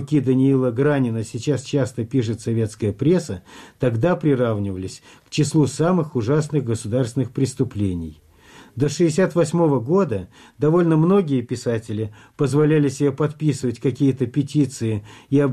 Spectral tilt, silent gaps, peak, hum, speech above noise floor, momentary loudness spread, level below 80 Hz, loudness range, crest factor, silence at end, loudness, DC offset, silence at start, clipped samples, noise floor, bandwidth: -7 dB/octave; none; -8 dBFS; none; 27 dB; 10 LU; -52 dBFS; 3 LU; 12 dB; 0 s; -21 LUFS; under 0.1%; 0 s; under 0.1%; -47 dBFS; 12.5 kHz